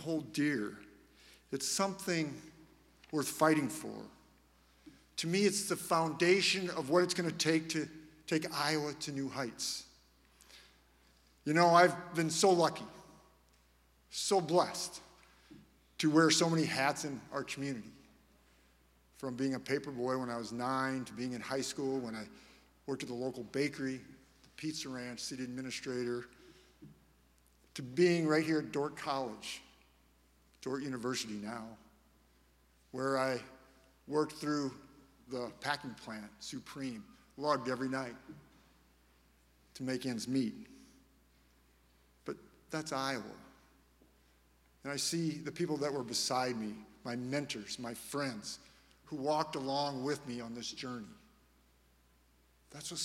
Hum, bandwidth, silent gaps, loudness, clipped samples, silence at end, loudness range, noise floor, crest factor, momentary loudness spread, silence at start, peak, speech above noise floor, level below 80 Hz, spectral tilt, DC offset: none; 16 kHz; none; -35 LUFS; under 0.1%; 0 s; 10 LU; -69 dBFS; 24 dB; 17 LU; 0 s; -12 dBFS; 34 dB; -70 dBFS; -4 dB/octave; under 0.1%